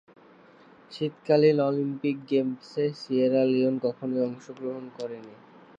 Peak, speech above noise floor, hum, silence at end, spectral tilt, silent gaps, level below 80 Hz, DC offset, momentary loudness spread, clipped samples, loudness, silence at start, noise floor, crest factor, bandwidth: -8 dBFS; 28 dB; none; 0.45 s; -8 dB/octave; none; -78 dBFS; under 0.1%; 15 LU; under 0.1%; -26 LUFS; 0.9 s; -54 dBFS; 18 dB; 7.8 kHz